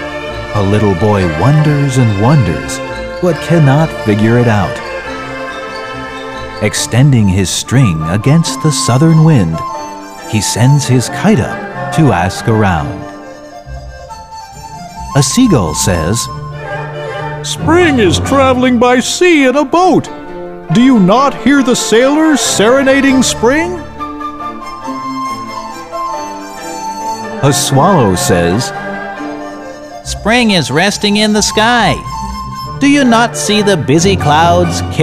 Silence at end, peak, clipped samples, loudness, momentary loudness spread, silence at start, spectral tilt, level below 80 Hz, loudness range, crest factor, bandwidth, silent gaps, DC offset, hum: 0 s; 0 dBFS; under 0.1%; -11 LUFS; 15 LU; 0 s; -5 dB/octave; -34 dBFS; 6 LU; 12 dB; 15.5 kHz; none; under 0.1%; none